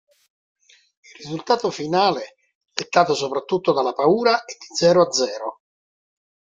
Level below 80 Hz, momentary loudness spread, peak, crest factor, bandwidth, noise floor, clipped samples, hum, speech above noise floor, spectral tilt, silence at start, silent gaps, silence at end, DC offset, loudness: -66 dBFS; 15 LU; -2 dBFS; 20 dB; 9 kHz; under -90 dBFS; under 0.1%; none; over 70 dB; -4 dB/octave; 1.2 s; 2.55-2.61 s; 1.05 s; under 0.1%; -20 LUFS